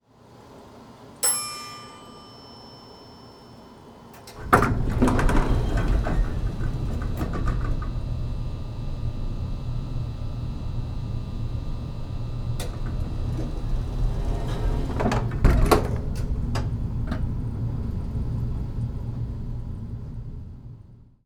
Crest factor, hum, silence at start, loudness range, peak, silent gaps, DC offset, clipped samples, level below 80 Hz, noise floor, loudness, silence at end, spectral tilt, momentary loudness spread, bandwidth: 24 dB; none; 0.3 s; 7 LU; -2 dBFS; none; under 0.1%; under 0.1%; -30 dBFS; -50 dBFS; -28 LUFS; 0.25 s; -5.5 dB/octave; 22 LU; 19 kHz